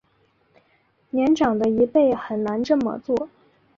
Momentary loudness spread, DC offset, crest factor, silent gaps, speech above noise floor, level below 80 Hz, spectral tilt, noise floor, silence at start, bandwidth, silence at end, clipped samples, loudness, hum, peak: 8 LU; under 0.1%; 16 dB; none; 43 dB; -58 dBFS; -6.5 dB/octave; -63 dBFS; 1.15 s; 7.6 kHz; 0.5 s; under 0.1%; -21 LUFS; none; -6 dBFS